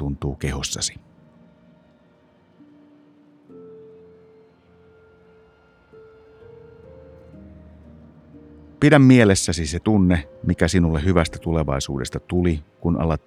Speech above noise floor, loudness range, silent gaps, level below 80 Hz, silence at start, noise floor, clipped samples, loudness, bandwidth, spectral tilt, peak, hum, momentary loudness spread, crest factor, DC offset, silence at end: 37 dB; 14 LU; none; -40 dBFS; 0 s; -56 dBFS; under 0.1%; -19 LUFS; 14.5 kHz; -5.5 dB/octave; 0 dBFS; none; 13 LU; 22 dB; under 0.1%; 0.1 s